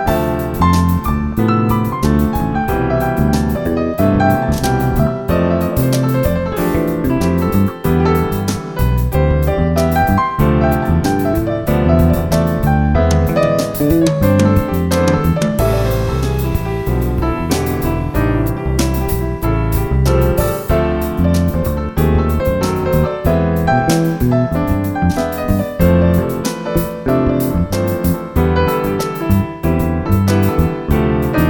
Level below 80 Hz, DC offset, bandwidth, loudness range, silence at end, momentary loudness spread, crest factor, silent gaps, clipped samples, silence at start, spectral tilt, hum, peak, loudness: -22 dBFS; 0.4%; over 20 kHz; 2 LU; 0 s; 4 LU; 14 dB; none; under 0.1%; 0 s; -7 dB/octave; none; 0 dBFS; -15 LUFS